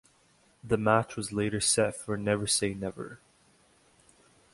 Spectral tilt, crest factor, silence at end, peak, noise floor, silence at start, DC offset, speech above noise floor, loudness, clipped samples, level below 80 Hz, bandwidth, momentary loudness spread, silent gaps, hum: -3.5 dB/octave; 22 dB; 1.35 s; -8 dBFS; -65 dBFS; 0.65 s; under 0.1%; 36 dB; -28 LUFS; under 0.1%; -58 dBFS; 11.5 kHz; 12 LU; none; none